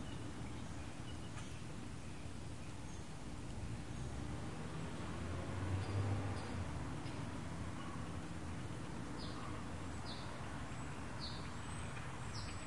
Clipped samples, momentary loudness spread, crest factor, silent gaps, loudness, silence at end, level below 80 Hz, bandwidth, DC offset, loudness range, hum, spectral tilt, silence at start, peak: under 0.1%; 7 LU; 18 dB; none; -46 LUFS; 0 s; -56 dBFS; 11.5 kHz; 0.3%; 5 LU; none; -5.5 dB/octave; 0 s; -28 dBFS